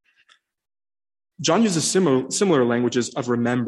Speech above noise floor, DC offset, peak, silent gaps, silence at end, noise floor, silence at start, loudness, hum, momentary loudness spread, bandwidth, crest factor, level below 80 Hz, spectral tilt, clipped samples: 40 dB; under 0.1%; -6 dBFS; none; 0 s; -60 dBFS; 1.4 s; -20 LUFS; none; 6 LU; 12.5 kHz; 16 dB; -66 dBFS; -4.5 dB/octave; under 0.1%